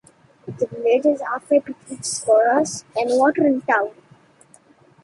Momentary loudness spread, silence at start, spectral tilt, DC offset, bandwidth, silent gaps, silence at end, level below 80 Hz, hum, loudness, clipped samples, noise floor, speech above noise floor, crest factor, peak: 13 LU; 0.45 s; -4 dB/octave; under 0.1%; 11.5 kHz; none; 1.15 s; -66 dBFS; none; -20 LUFS; under 0.1%; -53 dBFS; 33 dB; 16 dB; -4 dBFS